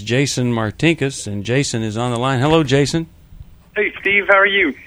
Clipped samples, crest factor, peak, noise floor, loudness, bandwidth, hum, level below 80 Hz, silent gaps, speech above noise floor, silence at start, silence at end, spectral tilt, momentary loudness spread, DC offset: under 0.1%; 18 dB; 0 dBFS; -40 dBFS; -17 LUFS; over 20 kHz; none; -44 dBFS; none; 24 dB; 0 s; 0 s; -5 dB/octave; 10 LU; under 0.1%